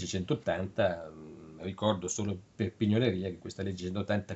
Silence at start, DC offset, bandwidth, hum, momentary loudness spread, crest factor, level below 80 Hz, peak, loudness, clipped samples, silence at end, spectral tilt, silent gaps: 0 s; under 0.1%; 8.2 kHz; none; 13 LU; 20 dB; -62 dBFS; -12 dBFS; -33 LUFS; under 0.1%; 0 s; -5.5 dB/octave; none